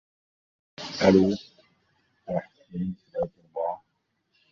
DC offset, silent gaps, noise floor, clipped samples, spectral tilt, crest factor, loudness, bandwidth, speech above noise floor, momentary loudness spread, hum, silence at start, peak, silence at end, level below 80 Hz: under 0.1%; none; -76 dBFS; under 0.1%; -6.5 dB/octave; 24 dB; -27 LUFS; 7.2 kHz; 53 dB; 20 LU; none; 0.8 s; -4 dBFS; 0.75 s; -56 dBFS